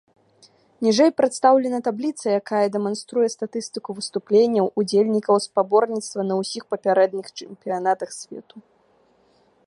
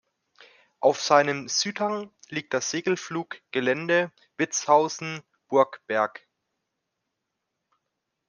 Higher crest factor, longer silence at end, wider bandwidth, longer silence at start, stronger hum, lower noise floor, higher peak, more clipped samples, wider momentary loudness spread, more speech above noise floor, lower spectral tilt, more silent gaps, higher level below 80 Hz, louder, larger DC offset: second, 18 dB vs 24 dB; second, 1.05 s vs 2.2 s; about the same, 11.5 kHz vs 10.5 kHz; about the same, 0.8 s vs 0.8 s; neither; second, -60 dBFS vs -82 dBFS; about the same, -4 dBFS vs -4 dBFS; neither; about the same, 13 LU vs 13 LU; second, 39 dB vs 57 dB; first, -5 dB/octave vs -3 dB/octave; neither; about the same, -74 dBFS vs -78 dBFS; first, -21 LUFS vs -25 LUFS; neither